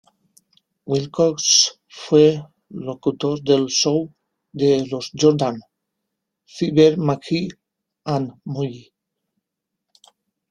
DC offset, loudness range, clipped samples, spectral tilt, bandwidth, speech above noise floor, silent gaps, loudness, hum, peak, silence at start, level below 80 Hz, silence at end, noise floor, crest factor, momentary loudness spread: under 0.1%; 5 LU; under 0.1%; -4.5 dB/octave; 12 kHz; 63 dB; none; -19 LUFS; none; -2 dBFS; 0.85 s; -60 dBFS; 1.7 s; -81 dBFS; 20 dB; 17 LU